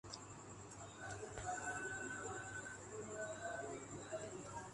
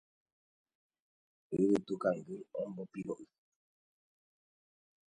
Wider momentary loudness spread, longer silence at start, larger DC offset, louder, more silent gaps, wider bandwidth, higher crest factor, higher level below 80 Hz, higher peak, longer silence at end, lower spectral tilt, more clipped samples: second, 9 LU vs 13 LU; second, 0.05 s vs 1.5 s; neither; second, -48 LUFS vs -37 LUFS; neither; first, 11.5 kHz vs 10 kHz; about the same, 18 dB vs 22 dB; first, -68 dBFS vs -76 dBFS; second, -30 dBFS vs -18 dBFS; second, 0 s vs 1.85 s; second, -3.5 dB/octave vs -7.5 dB/octave; neither